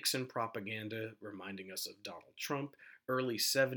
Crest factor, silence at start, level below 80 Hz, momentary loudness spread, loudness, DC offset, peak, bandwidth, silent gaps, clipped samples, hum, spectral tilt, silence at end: 22 dB; 0 s; -86 dBFS; 15 LU; -39 LUFS; under 0.1%; -18 dBFS; 19.5 kHz; none; under 0.1%; none; -3 dB/octave; 0 s